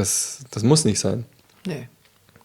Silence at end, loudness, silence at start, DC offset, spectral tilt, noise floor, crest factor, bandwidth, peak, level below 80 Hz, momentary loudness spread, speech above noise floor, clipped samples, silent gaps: 0.6 s; -22 LUFS; 0 s; under 0.1%; -4.5 dB/octave; -55 dBFS; 20 dB; 19.5 kHz; -2 dBFS; -58 dBFS; 17 LU; 33 dB; under 0.1%; none